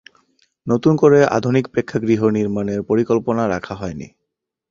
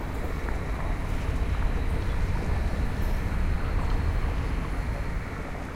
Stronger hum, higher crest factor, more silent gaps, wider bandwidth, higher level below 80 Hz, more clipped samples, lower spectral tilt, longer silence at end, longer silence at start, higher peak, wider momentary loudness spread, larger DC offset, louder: neither; about the same, 16 dB vs 14 dB; neither; second, 7.4 kHz vs 15 kHz; second, -50 dBFS vs -28 dBFS; neither; about the same, -7.5 dB/octave vs -7 dB/octave; first, 0.65 s vs 0 s; first, 0.65 s vs 0 s; first, -2 dBFS vs -14 dBFS; first, 15 LU vs 4 LU; neither; first, -17 LUFS vs -31 LUFS